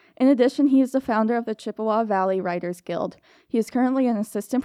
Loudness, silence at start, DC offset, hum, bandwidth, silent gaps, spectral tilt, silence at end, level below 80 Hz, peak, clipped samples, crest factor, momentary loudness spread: -23 LUFS; 0.2 s; under 0.1%; none; 14 kHz; none; -6.5 dB/octave; 0 s; -68 dBFS; -6 dBFS; under 0.1%; 16 dB; 11 LU